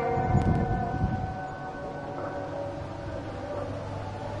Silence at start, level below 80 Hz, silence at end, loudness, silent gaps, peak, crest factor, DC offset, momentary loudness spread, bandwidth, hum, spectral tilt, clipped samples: 0 s; -42 dBFS; 0 s; -31 LUFS; none; -12 dBFS; 18 dB; under 0.1%; 11 LU; 10.5 kHz; none; -8 dB/octave; under 0.1%